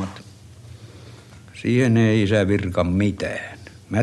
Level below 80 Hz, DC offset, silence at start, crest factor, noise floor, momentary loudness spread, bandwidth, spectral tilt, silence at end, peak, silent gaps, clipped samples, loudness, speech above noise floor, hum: -48 dBFS; under 0.1%; 0 s; 16 dB; -43 dBFS; 24 LU; 11.5 kHz; -7 dB/octave; 0 s; -6 dBFS; none; under 0.1%; -20 LUFS; 24 dB; none